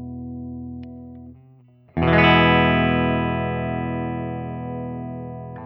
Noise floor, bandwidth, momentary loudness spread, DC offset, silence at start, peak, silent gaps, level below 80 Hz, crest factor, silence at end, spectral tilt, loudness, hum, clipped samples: -51 dBFS; 5.8 kHz; 20 LU; under 0.1%; 0 s; -2 dBFS; none; -40 dBFS; 20 dB; 0 s; -9 dB/octave; -20 LUFS; none; under 0.1%